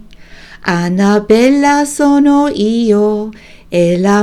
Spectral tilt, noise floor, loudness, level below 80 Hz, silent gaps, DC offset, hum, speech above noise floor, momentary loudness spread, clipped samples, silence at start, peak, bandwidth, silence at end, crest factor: -6 dB/octave; -35 dBFS; -11 LUFS; -42 dBFS; none; under 0.1%; none; 24 dB; 9 LU; 0.1%; 0.1 s; 0 dBFS; 13.5 kHz; 0 s; 12 dB